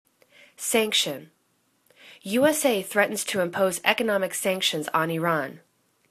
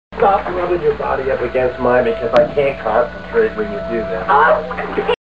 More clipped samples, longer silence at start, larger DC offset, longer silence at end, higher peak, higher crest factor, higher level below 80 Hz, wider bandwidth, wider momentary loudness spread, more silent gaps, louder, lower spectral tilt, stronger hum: neither; first, 0.6 s vs 0.1 s; second, under 0.1% vs 1%; first, 0.5 s vs 0.05 s; about the same, -2 dBFS vs 0 dBFS; first, 24 dB vs 16 dB; second, -72 dBFS vs -38 dBFS; first, 14 kHz vs 7.4 kHz; about the same, 8 LU vs 7 LU; neither; second, -24 LUFS vs -16 LUFS; second, -3 dB/octave vs -7 dB/octave; second, none vs 60 Hz at -35 dBFS